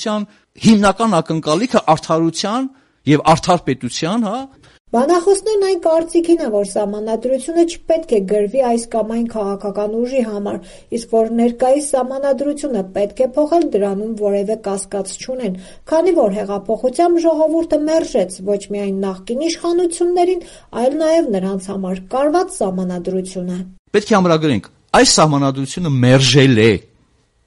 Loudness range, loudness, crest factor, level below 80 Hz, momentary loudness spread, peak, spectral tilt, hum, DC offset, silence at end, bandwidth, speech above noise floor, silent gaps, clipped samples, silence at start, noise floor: 4 LU; -16 LUFS; 16 dB; -46 dBFS; 11 LU; 0 dBFS; -5 dB/octave; none; under 0.1%; 0.65 s; 11.5 kHz; 41 dB; 4.80-4.85 s, 23.79-23.85 s; under 0.1%; 0 s; -57 dBFS